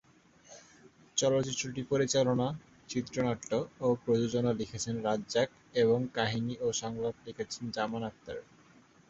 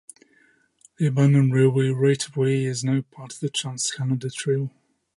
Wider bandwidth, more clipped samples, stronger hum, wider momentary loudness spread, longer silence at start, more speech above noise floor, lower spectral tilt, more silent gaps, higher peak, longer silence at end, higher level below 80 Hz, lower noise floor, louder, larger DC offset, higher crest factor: second, 8.2 kHz vs 11.5 kHz; neither; neither; about the same, 11 LU vs 9 LU; second, 0.5 s vs 1 s; second, 29 dB vs 39 dB; second, -4.5 dB/octave vs -6 dB/octave; neither; second, -14 dBFS vs -6 dBFS; first, 0.7 s vs 0.45 s; about the same, -64 dBFS vs -68 dBFS; about the same, -61 dBFS vs -61 dBFS; second, -32 LUFS vs -22 LUFS; neither; about the same, 18 dB vs 16 dB